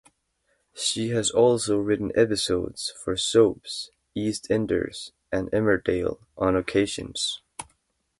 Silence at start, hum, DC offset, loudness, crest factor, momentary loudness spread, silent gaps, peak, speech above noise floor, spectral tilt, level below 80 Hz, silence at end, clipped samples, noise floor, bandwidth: 0.75 s; none; under 0.1%; -25 LUFS; 20 dB; 13 LU; none; -6 dBFS; 47 dB; -4 dB/octave; -50 dBFS; 0.55 s; under 0.1%; -72 dBFS; 11.5 kHz